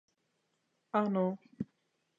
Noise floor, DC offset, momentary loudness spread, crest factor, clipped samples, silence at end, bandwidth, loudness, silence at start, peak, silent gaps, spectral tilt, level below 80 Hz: -80 dBFS; under 0.1%; 13 LU; 22 dB; under 0.1%; 0.55 s; 7 kHz; -34 LUFS; 0.95 s; -16 dBFS; none; -9.5 dB/octave; -76 dBFS